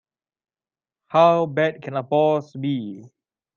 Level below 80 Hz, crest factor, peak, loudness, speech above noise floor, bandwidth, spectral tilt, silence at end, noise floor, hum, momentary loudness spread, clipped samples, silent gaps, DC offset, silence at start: -72 dBFS; 18 dB; -4 dBFS; -21 LUFS; over 70 dB; 7 kHz; -7.5 dB/octave; 0.5 s; under -90 dBFS; none; 12 LU; under 0.1%; none; under 0.1%; 1.15 s